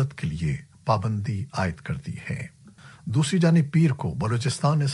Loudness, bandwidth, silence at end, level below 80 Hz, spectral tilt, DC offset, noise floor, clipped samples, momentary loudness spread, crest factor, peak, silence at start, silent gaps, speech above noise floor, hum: -25 LUFS; 11.5 kHz; 0 s; -50 dBFS; -6.5 dB/octave; under 0.1%; -49 dBFS; under 0.1%; 13 LU; 16 dB; -8 dBFS; 0 s; none; 25 dB; none